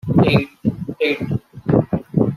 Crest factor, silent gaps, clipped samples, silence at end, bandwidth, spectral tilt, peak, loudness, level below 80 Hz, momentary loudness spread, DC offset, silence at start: 16 dB; none; under 0.1%; 0 s; 13.5 kHz; -8.5 dB/octave; -2 dBFS; -19 LUFS; -44 dBFS; 9 LU; under 0.1%; 0.05 s